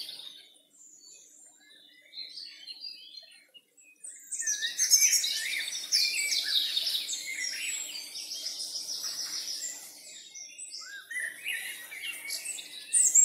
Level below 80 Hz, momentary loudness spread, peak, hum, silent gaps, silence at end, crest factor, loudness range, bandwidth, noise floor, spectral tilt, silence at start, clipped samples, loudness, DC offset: under -90 dBFS; 21 LU; -8 dBFS; none; none; 0 s; 26 dB; 19 LU; 16 kHz; -58 dBFS; 5 dB/octave; 0 s; under 0.1%; -29 LUFS; under 0.1%